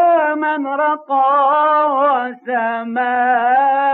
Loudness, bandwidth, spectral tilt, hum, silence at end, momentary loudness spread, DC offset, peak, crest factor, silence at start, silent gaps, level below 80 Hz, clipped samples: -15 LUFS; 4.2 kHz; -7 dB/octave; none; 0 s; 7 LU; under 0.1%; -6 dBFS; 10 dB; 0 s; none; -74 dBFS; under 0.1%